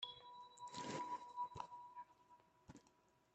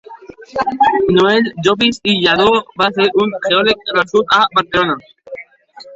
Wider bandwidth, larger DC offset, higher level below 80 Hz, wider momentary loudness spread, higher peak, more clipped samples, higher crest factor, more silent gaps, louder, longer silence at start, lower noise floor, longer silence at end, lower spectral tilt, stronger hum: about the same, 8.8 kHz vs 8 kHz; neither; second, -84 dBFS vs -48 dBFS; first, 18 LU vs 13 LU; second, -32 dBFS vs 0 dBFS; neither; first, 22 dB vs 14 dB; neither; second, -51 LUFS vs -13 LUFS; about the same, 0 s vs 0.1 s; first, -76 dBFS vs -40 dBFS; first, 0.25 s vs 0 s; second, -3.5 dB/octave vs -5 dB/octave; neither